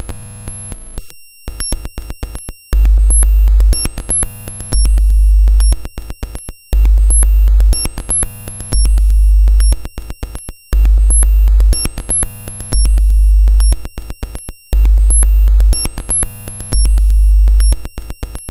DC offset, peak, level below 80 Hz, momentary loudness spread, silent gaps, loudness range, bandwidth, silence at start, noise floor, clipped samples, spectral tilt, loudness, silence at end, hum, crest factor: under 0.1%; 0 dBFS; -12 dBFS; 17 LU; none; 2 LU; 14.5 kHz; 0 s; -30 dBFS; under 0.1%; -4 dB/octave; -13 LUFS; 0 s; none; 10 dB